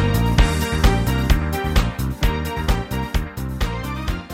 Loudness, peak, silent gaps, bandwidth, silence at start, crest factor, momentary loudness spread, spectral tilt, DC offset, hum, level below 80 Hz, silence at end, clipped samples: -21 LUFS; -4 dBFS; none; 16.5 kHz; 0 s; 16 dB; 8 LU; -5.5 dB/octave; under 0.1%; none; -22 dBFS; 0 s; under 0.1%